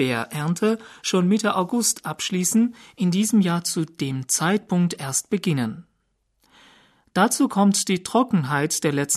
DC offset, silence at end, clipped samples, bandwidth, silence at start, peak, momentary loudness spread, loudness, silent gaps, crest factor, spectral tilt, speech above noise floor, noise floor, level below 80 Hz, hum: under 0.1%; 0 s; under 0.1%; 13.5 kHz; 0 s; -6 dBFS; 7 LU; -22 LUFS; none; 16 dB; -4.5 dB/octave; 49 dB; -70 dBFS; -66 dBFS; none